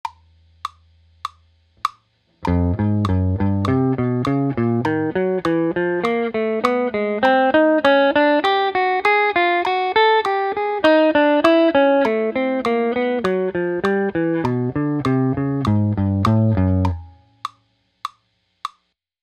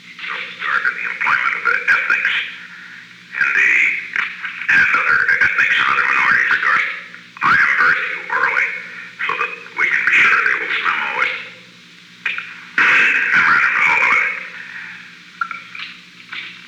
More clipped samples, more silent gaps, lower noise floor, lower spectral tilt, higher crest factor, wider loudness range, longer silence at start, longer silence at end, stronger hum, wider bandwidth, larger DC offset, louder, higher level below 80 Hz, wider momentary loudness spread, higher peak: neither; neither; first, -66 dBFS vs -43 dBFS; first, -7.5 dB/octave vs -1.5 dB/octave; about the same, 18 dB vs 14 dB; first, 6 LU vs 3 LU; about the same, 0.05 s vs 0.05 s; first, 0.55 s vs 0 s; neither; second, 11.5 kHz vs 13 kHz; neither; second, -18 LUFS vs -15 LUFS; first, -44 dBFS vs -62 dBFS; about the same, 19 LU vs 18 LU; first, 0 dBFS vs -4 dBFS